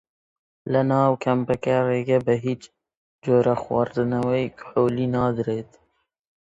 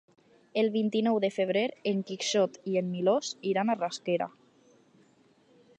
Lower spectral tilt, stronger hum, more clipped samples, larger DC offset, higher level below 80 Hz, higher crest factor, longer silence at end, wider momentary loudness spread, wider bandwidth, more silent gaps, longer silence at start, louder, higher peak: first, -8.5 dB/octave vs -5 dB/octave; neither; neither; neither; first, -56 dBFS vs -84 dBFS; about the same, 18 dB vs 16 dB; second, 0.85 s vs 1.5 s; first, 8 LU vs 4 LU; second, 8 kHz vs 9.8 kHz; first, 2.97-3.19 s vs none; about the same, 0.65 s vs 0.55 s; first, -23 LUFS vs -29 LUFS; first, -6 dBFS vs -14 dBFS